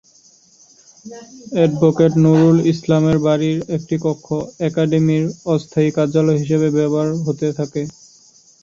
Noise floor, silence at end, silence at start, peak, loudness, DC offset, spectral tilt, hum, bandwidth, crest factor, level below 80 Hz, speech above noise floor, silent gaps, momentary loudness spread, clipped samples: -51 dBFS; 0.75 s; 1.05 s; -2 dBFS; -17 LUFS; under 0.1%; -7.5 dB/octave; none; 7.6 kHz; 16 dB; -54 dBFS; 35 dB; none; 12 LU; under 0.1%